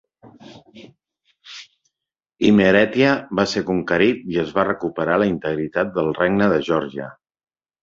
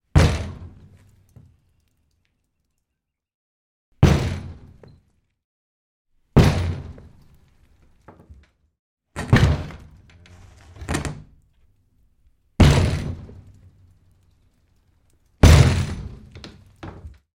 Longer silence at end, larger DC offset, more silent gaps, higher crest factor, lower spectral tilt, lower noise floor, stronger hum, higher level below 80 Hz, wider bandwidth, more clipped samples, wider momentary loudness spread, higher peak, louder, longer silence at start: first, 0.7 s vs 0.25 s; neither; second, none vs 3.34-3.92 s, 5.44-6.05 s, 8.79-8.97 s; about the same, 20 dB vs 24 dB; about the same, -6 dB/octave vs -6 dB/octave; first, -85 dBFS vs -81 dBFS; neither; second, -52 dBFS vs -30 dBFS; second, 7.6 kHz vs 16.5 kHz; neither; second, 17 LU vs 26 LU; about the same, -2 dBFS vs 0 dBFS; about the same, -19 LUFS vs -19 LUFS; about the same, 0.25 s vs 0.15 s